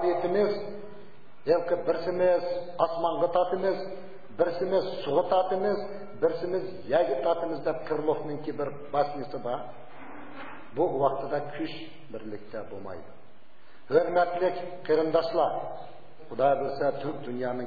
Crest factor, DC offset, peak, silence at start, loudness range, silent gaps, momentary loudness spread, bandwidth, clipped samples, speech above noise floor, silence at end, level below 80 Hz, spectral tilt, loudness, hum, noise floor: 20 dB; 1%; -8 dBFS; 0 s; 5 LU; none; 17 LU; 4.9 kHz; under 0.1%; 30 dB; 0 s; -68 dBFS; -8 dB/octave; -28 LUFS; none; -58 dBFS